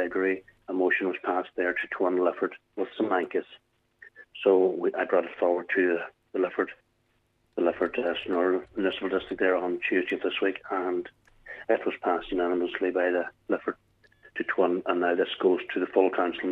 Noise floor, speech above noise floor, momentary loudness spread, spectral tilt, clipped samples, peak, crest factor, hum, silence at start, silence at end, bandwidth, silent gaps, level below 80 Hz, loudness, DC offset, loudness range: -71 dBFS; 44 dB; 9 LU; -7 dB/octave; under 0.1%; -8 dBFS; 20 dB; none; 0 s; 0 s; 4.1 kHz; none; -64 dBFS; -28 LUFS; under 0.1%; 2 LU